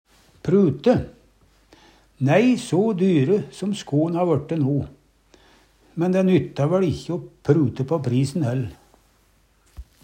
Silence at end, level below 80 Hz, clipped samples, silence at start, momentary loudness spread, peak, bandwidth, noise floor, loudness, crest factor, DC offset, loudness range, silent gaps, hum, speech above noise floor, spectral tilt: 0.2 s; -52 dBFS; under 0.1%; 0.45 s; 10 LU; -4 dBFS; 10 kHz; -60 dBFS; -21 LUFS; 18 dB; under 0.1%; 3 LU; none; none; 40 dB; -7.5 dB/octave